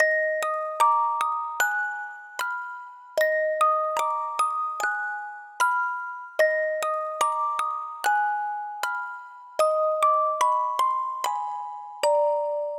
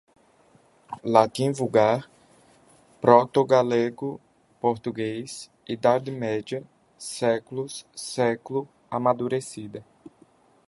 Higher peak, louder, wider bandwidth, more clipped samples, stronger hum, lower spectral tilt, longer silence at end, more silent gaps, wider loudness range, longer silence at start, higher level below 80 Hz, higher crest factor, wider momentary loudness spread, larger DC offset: second, -8 dBFS vs -2 dBFS; about the same, -25 LUFS vs -24 LUFS; first, 19.5 kHz vs 12 kHz; neither; neither; second, 1 dB/octave vs -5.5 dB/octave; second, 0 s vs 0.6 s; neither; second, 2 LU vs 6 LU; second, 0 s vs 0.9 s; second, -84 dBFS vs -68 dBFS; second, 18 dB vs 24 dB; second, 11 LU vs 16 LU; neither